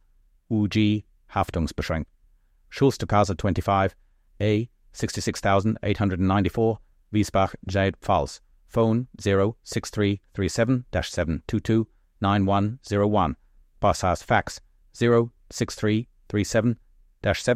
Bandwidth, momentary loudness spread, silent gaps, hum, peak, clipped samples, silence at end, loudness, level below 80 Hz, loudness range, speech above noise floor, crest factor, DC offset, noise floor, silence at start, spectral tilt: 14.5 kHz; 9 LU; none; none; -6 dBFS; under 0.1%; 0 s; -25 LUFS; -44 dBFS; 1 LU; 37 dB; 18 dB; under 0.1%; -60 dBFS; 0.5 s; -6 dB/octave